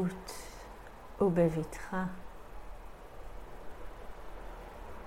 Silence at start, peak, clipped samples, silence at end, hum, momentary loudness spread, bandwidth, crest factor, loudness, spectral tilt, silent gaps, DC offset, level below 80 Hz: 0 s; -16 dBFS; under 0.1%; 0 s; none; 21 LU; 16 kHz; 22 dB; -34 LUFS; -7 dB/octave; none; under 0.1%; -50 dBFS